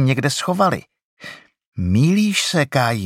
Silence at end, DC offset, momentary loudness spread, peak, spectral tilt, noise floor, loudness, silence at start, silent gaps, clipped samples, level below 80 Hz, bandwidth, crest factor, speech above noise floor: 0 s; under 0.1%; 21 LU; -2 dBFS; -5 dB/octave; -40 dBFS; -18 LUFS; 0 s; 1.04-1.17 s, 1.66-1.72 s; under 0.1%; -48 dBFS; 16 kHz; 16 dB; 22 dB